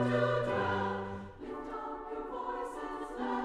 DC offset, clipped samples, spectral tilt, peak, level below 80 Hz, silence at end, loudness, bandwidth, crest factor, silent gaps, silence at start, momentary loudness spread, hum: under 0.1%; under 0.1%; -7 dB/octave; -18 dBFS; -58 dBFS; 0 s; -36 LUFS; 12 kHz; 16 dB; none; 0 s; 12 LU; none